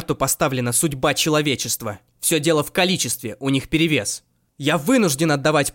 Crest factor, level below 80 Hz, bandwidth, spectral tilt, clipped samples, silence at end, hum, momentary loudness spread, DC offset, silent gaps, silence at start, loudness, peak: 14 dB; -50 dBFS; 17 kHz; -3.5 dB/octave; under 0.1%; 0.05 s; none; 7 LU; under 0.1%; none; 0 s; -20 LUFS; -6 dBFS